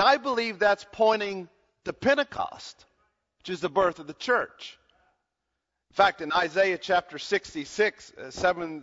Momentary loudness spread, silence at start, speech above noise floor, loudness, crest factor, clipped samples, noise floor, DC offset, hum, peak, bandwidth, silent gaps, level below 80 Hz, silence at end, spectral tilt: 15 LU; 0 s; 56 dB; -26 LUFS; 20 dB; under 0.1%; -83 dBFS; under 0.1%; none; -8 dBFS; 7.8 kHz; none; -62 dBFS; 0 s; -3.5 dB/octave